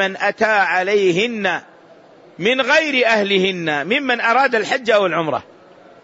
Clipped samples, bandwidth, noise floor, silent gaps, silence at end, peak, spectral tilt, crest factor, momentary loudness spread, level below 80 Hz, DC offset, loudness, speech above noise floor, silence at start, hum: under 0.1%; 8 kHz; -45 dBFS; none; 0.6 s; -2 dBFS; -4 dB/octave; 16 dB; 7 LU; -64 dBFS; under 0.1%; -16 LUFS; 29 dB; 0 s; none